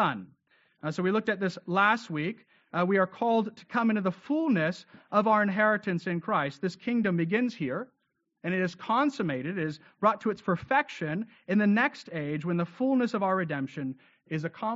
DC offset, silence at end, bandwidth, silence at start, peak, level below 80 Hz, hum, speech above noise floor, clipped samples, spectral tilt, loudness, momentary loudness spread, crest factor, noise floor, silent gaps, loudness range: under 0.1%; 0 s; 7.6 kHz; 0 s; -10 dBFS; -72 dBFS; none; 47 dB; under 0.1%; -5 dB/octave; -29 LUFS; 11 LU; 18 dB; -76 dBFS; none; 3 LU